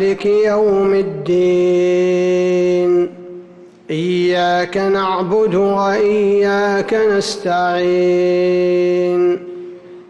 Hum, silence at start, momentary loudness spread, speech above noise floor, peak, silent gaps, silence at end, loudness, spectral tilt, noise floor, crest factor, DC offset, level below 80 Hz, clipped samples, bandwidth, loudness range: none; 0 s; 5 LU; 25 dB; -6 dBFS; none; 0.05 s; -15 LUFS; -6 dB/octave; -39 dBFS; 8 dB; under 0.1%; -54 dBFS; under 0.1%; 9.6 kHz; 2 LU